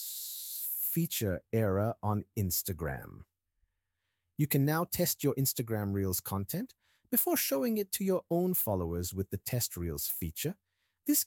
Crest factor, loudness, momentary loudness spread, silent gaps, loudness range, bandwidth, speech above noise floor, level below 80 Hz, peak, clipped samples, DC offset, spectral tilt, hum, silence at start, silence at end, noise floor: 20 dB; -32 LUFS; 9 LU; none; 3 LU; 19 kHz; 52 dB; -56 dBFS; -14 dBFS; under 0.1%; under 0.1%; -5 dB/octave; none; 0 s; 0 s; -84 dBFS